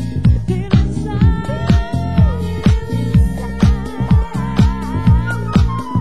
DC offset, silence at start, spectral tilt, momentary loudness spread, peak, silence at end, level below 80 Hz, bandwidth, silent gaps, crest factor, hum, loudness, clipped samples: 3%; 0 s; -8 dB/octave; 3 LU; 0 dBFS; 0 s; -20 dBFS; 12.5 kHz; none; 14 dB; none; -16 LUFS; under 0.1%